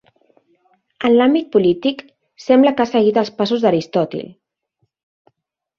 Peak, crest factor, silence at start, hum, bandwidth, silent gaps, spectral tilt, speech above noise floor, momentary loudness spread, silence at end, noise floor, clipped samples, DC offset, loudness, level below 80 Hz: -2 dBFS; 16 dB; 1 s; none; 7.2 kHz; none; -6.5 dB/octave; 57 dB; 14 LU; 1.55 s; -72 dBFS; under 0.1%; under 0.1%; -16 LUFS; -60 dBFS